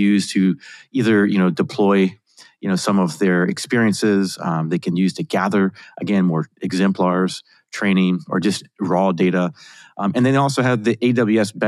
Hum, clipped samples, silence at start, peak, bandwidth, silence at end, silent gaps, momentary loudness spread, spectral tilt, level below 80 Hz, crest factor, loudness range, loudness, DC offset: none; under 0.1%; 0 s; -4 dBFS; 12.5 kHz; 0 s; none; 8 LU; -6 dB/octave; -70 dBFS; 14 dB; 2 LU; -19 LUFS; under 0.1%